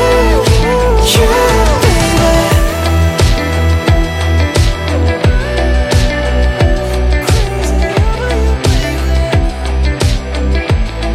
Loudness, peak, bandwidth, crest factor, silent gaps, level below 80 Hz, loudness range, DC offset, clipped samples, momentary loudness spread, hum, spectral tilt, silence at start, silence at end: -12 LUFS; 0 dBFS; 16 kHz; 10 dB; none; -14 dBFS; 3 LU; under 0.1%; under 0.1%; 5 LU; none; -5 dB/octave; 0 s; 0 s